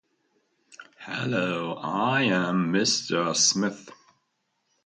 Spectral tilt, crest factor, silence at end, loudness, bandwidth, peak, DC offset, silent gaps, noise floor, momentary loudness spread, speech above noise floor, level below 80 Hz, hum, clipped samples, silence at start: -3 dB/octave; 20 dB; 0.9 s; -24 LUFS; 9.6 kHz; -8 dBFS; under 0.1%; none; -75 dBFS; 11 LU; 50 dB; -72 dBFS; none; under 0.1%; 0.7 s